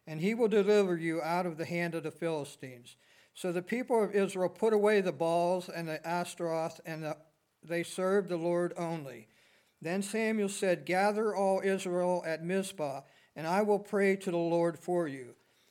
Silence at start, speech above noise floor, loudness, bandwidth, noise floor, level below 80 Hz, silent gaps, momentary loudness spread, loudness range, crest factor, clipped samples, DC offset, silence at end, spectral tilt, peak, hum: 0.05 s; 34 dB; -32 LUFS; 16 kHz; -66 dBFS; -88 dBFS; none; 12 LU; 4 LU; 16 dB; under 0.1%; under 0.1%; 0.4 s; -5.5 dB/octave; -16 dBFS; none